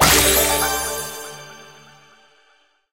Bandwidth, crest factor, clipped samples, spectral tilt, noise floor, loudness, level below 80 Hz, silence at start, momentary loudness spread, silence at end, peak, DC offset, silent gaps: 16 kHz; 22 dB; under 0.1%; -1.5 dB/octave; -59 dBFS; -17 LUFS; -36 dBFS; 0 s; 24 LU; 1.3 s; 0 dBFS; 0.2%; none